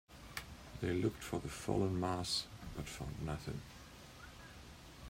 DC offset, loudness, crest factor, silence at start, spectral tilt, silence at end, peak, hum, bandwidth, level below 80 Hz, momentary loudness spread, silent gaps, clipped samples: under 0.1%; -41 LUFS; 22 dB; 0.1 s; -5 dB/octave; 0 s; -20 dBFS; none; 16 kHz; -56 dBFS; 18 LU; none; under 0.1%